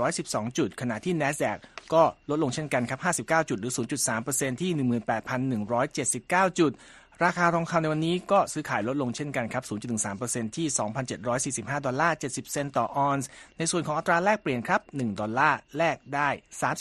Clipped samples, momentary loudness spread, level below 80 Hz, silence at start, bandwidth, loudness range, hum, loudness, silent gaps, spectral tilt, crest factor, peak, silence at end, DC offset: under 0.1%; 7 LU; -62 dBFS; 0 s; 13 kHz; 3 LU; none; -27 LUFS; none; -4.5 dB/octave; 20 dB; -8 dBFS; 0 s; under 0.1%